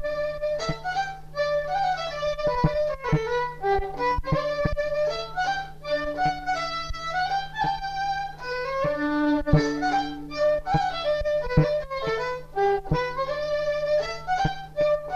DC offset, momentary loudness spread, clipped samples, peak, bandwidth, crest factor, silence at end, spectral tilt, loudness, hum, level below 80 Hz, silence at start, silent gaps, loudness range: under 0.1%; 6 LU; under 0.1%; -6 dBFS; 13.5 kHz; 20 dB; 0 s; -6 dB/octave; -26 LUFS; none; -40 dBFS; 0 s; none; 3 LU